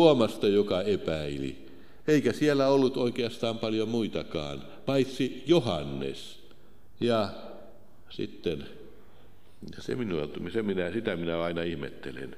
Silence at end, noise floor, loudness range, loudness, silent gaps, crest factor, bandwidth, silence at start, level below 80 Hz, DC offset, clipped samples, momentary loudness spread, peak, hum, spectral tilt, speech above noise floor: 0 s; -58 dBFS; 8 LU; -29 LUFS; none; 22 dB; 15 kHz; 0 s; -56 dBFS; 0.7%; under 0.1%; 16 LU; -6 dBFS; none; -6 dB/octave; 29 dB